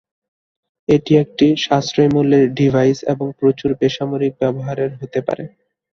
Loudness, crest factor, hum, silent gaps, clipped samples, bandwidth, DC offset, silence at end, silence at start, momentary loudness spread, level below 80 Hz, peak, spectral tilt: -17 LUFS; 16 dB; none; none; under 0.1%; 7.2 kHz; under 0.1%; 0.45 s; 0.9 s; 9 LU; -52 dBFS; 0 dBFS; -7 dB/octave